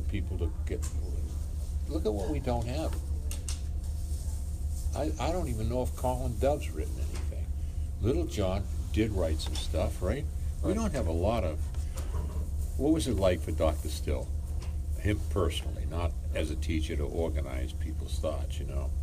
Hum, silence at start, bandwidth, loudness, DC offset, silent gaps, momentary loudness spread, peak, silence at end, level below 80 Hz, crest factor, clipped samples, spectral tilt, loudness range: none; 0 s; 15.5 kHz; -33 LUFS; under 0.1%; none; 7 LU; -14 dBFS; 0 s; -34 dBFS; 16 dB; under 0.1%; -6.5 dB/octave; 3 LU